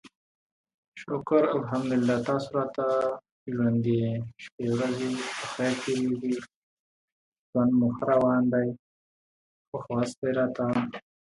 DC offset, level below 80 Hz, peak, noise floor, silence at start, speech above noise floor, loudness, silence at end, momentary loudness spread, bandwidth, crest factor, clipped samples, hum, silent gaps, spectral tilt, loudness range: under 0.1%; -64 dBFS; -10 dBFS; under -90 dBFS; 0.95 s; over 63 dB; -27 LUFS; 0.35 s; 11 LU; 11.5 kHz; 18 dB; under 0.1%; none; 3.32-3.46 s, 4.52-4.58 s, 6.55-7.32 s, 7.38-7.53 s, 8.79-9.72 s, 10.17-10.22 s; -6.5 dB/octave; 3 LU